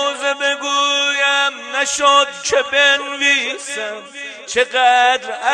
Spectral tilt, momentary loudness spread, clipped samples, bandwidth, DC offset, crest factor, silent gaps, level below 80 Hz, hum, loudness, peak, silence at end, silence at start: 1 dB/octave; 11 LU; under 0.1%; 12.5 kHz; under 0.1%; 16 dB; none; -62 dBFS; none; -15 LUFS; 0 dBFS; 0 s; 0 s